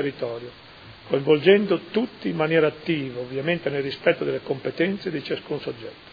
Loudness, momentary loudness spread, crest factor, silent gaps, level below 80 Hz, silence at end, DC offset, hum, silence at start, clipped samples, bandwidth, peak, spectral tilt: -24 LUFS; 16 LU; 20 dB; none; -62 dBFS; 0.05 s; under 0.1%; none; 0 s; under 0.1%; 5 kHz; -4 dBFS; -8 dB/octave